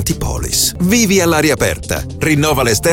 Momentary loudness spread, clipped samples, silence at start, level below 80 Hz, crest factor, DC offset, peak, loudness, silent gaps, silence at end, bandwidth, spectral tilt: 8 LU; under 0.1%; 0 s; -28 dBFS; 12 dB; under 0.1%; -2 dBFS; -14 LUFS; none; 0 s; 17 kHz; -4 dB/octave